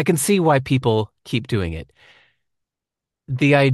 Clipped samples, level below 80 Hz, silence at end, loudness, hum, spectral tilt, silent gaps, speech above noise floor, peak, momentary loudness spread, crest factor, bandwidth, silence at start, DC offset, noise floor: under 0.1%; -44 dBFS; 0 s; -20 LUFS; none; -5.5 dB/octave; none; 68 dB; -4 dBFS; 12 LU; 18 dB; 12.5 kHz; 0 s; under 0.1%; -86 dBFS